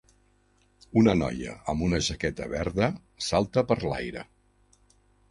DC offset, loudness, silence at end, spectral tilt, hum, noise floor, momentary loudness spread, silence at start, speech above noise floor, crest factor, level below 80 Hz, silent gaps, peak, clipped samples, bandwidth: under 0.1%; -27 LUFS; 1.1 s; -5.5 dB/octave; 50 Hz at -50 dBFS; -65 dBFS; 11 LU; 0.95 s; 38 dB; 20 dB; -46 dBFS; none; -8 dBFS; under 0.1%; 11.5 kHz